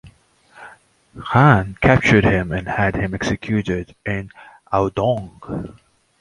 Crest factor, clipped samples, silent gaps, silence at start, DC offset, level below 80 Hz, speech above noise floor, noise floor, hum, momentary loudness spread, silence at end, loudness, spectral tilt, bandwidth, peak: 20 dB; under 0.1%; none; 0.05 s; under 0.1%; -38 dBFS; 34 dB; -52 dBFS; none; 17 LU; 0.5 s; -18 LUFS; -7 dB/octave; 11 kHz; 0 dBFS